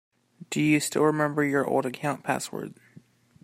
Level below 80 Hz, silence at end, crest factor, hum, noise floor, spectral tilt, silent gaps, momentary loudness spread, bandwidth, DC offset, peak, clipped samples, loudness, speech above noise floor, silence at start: -70 dBFS; 0.7 s; 18 dB; none; -55 dBFS; -5 dB/octave; none; 11 LU; 16 kHz; under 0.1%; -8 dBFS; under 0.1%; -26 LUFS; 30 dB; 0.4 s